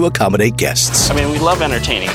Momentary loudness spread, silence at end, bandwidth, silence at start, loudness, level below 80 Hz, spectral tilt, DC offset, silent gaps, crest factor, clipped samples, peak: 4 LU; 0 s; 16.5 kHz; 0 s; -14 LUFS; -28 dBFS; -3.5 dB/octave; under 0.1%; none; 14 dB; under 0.1%; 0 dBFS